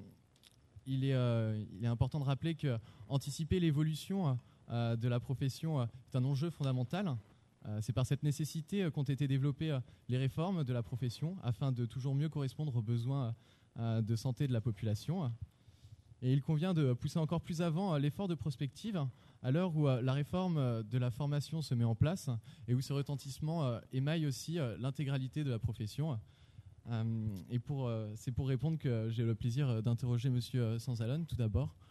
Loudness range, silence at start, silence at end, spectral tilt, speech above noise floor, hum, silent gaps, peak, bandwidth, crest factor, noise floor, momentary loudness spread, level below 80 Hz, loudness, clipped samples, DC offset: 3 LU; 0 s; 0.15 s; -7.5 dB/octave; 30 dB; none; none; -18 dBFS; 13 kHz; 18 dB; -66 dBFS; 7 LU; -60 dBFS; -37 LUFS; under 0.1%; under 0.1%